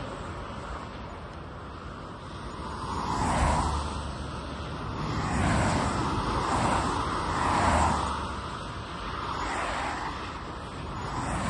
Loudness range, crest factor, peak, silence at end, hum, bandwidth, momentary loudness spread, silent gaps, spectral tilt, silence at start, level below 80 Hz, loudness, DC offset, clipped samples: 6 LU; 18 dB; -12 dBFS; 0 s; none; 11.5 kHz; 14 LU; none; -5 dB/octave; 0 s; -40 dBFS; -30 LUFS; under 0.1%; under 0.1%